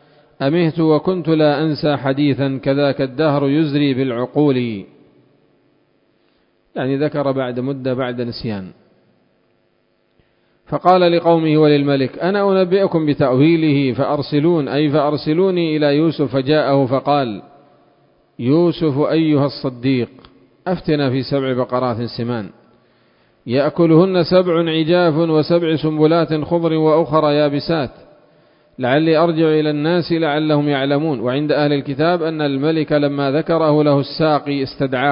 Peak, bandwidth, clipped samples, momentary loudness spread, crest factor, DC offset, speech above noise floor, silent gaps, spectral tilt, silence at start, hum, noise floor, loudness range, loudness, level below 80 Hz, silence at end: 0 dBFS; 5.4 kHz; under 0.1%; 9 LU; 16 dB; under 0.1%; 46 dB; none; -10.5 dB/octave; 0.4 s; none; -61 dBFS; 8 LU; -16 LUFS; -54 dBFS; 0 s